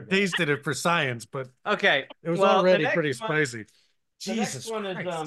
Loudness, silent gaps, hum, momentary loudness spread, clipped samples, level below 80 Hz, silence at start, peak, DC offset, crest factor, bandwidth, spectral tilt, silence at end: -25 LUFS; none; none; 13 LU; under 0.1%; -72 dBFS; 0 s; -10 dBFS; under 0.1%; 16 dB; 12.5 kHz; -4.5 dB/octave; 0 s